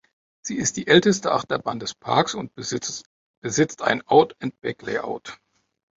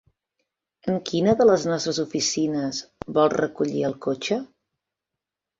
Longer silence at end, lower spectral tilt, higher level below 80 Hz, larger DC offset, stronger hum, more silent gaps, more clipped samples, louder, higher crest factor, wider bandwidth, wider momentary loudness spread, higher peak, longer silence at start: second, 0.6 s vs 1.15 s; about the same, -4 dB/octave vs -4.5 dB/octave; about the same, -60 dBFS vs -60 dBFS; neither; neither; first, 3.06-3.42 s vs none; neither; about the same, -22 LUFS vs -23 LUFS; about the same, 20 dB vs 18 dB; about the same, 8 kHz vs 7.8 kHz; first, 15 LU vs 10 LU; first, -2 dBFS vs -6 dBFS; second, 0.45 s vs 0.85 s